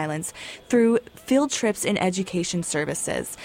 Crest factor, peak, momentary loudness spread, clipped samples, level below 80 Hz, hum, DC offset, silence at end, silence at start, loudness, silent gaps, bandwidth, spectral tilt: 14 dB; -10 dBFS; 8 LU; under 0.1%; -58 dBFS; none; under 0.1%; 0 s; 0 s; -24 LUFS; none; 16.5 kHz; -4 dB/octave